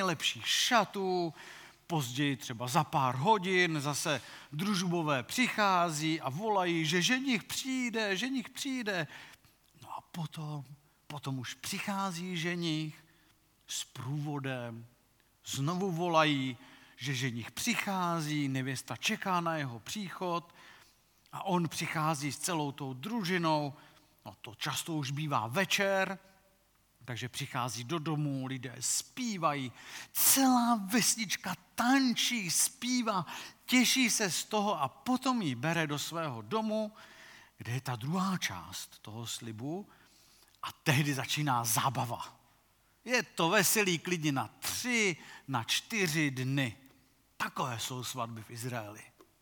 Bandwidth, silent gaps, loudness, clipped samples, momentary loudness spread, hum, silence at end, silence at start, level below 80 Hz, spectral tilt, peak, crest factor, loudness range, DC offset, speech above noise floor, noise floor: 19 kHz; none; -32 LUFS; under 0.1%; 15 LU; none; 0.35 s; 0 s; -76 dBFS; -3.5 dB/octave; -10 dBFS; 24 dB; 8 LU; under 0.1%; 36 dB; -69 dBFS